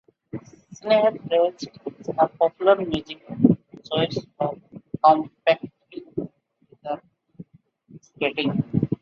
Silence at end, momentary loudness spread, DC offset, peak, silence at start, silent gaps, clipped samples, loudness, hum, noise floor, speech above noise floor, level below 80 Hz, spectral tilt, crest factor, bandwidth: 0.05 s; 19 LU; under 0.1%; -2 dBFS; 0.35 s; none; under 0.1%; -23 LUFS; none; -59 dBFS; 37 dB; -58 dBFS; -7 dB/octave; 22 dB; 7.2 kHz